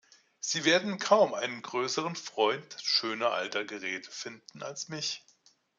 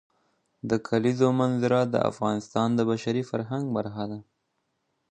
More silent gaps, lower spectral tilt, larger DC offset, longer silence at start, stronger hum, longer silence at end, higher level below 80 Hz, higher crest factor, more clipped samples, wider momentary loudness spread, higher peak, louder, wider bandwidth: neither; second, -2.5 dB/octave vs -7 dB/octave; neither; second, 0.45 s vs 0.65 s; neither; second, 0.6 s vs 0.9 s; second, -84 dBFS vs -64 dBFS; about the same, 22 dB vs 18 dB; neither; first, 15 LU vs 10 LU; about the same, -8 dBFS vs -8 dBFS; second, -30 LUFS vs -26 LUFS; about the same, 9.4 kHz vs 9.4 kHz